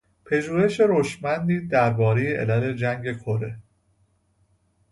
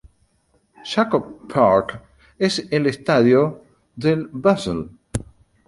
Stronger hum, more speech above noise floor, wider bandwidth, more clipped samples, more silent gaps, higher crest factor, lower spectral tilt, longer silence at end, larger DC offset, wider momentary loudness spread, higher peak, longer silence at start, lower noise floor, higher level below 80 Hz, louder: neither; about the same, 43 dB vs 45 dB; about the same, 11.5 kHz vs 11.5 kHz; neither; neither; about the same, 18 dB vs 18 dB; first, -7.5 dB/octave vs -6 dB/octave; first, 1.3 s vs 0.45 s; neither; second, 9 LU vs 15 LU; second, -6 dBFS vs -2 dBFS; second, 0.25 s vs 0.85 s; about the same, -65 dBFS vs -63 dBFS; second, -56 dBFS vs -48 dBFS; second, -23 LUFS vs -20 LUFS